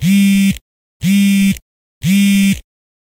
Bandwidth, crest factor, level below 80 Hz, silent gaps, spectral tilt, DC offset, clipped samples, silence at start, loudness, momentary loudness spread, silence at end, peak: 16.5 kHz; 10 dB; -40 dBFS; 0.61-1.00 s, 1.62-2.01 s; -5 dB/octave; under 0.1%; under 0.1%; 0 s; -13 LUFS; 11 LU; 0.4 s; -4 dBFS